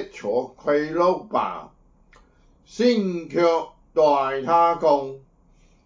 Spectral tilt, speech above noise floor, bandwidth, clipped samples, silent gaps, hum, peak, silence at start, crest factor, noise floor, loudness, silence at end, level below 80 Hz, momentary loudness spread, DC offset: -6 dB/octave; 35 dB; 7.6 kHz; under 0.1%; none; none; -4 dBFS; 0 s; 18 dB; -56 dBFS; -22 LUFS; 0.65 s; -58 dBFS; 8 LU; under 0.1%